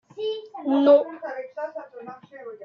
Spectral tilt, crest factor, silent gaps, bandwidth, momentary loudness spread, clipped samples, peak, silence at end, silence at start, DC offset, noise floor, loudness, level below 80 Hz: -6.5 dB/octave; 18 dB; none; 5.6 kHz; 24 LU; under 0.1%; -6 dBFS; 0 s; 0.15 s; under 0.1%; -42 dBFS; -23 LUFS; -82 dBFS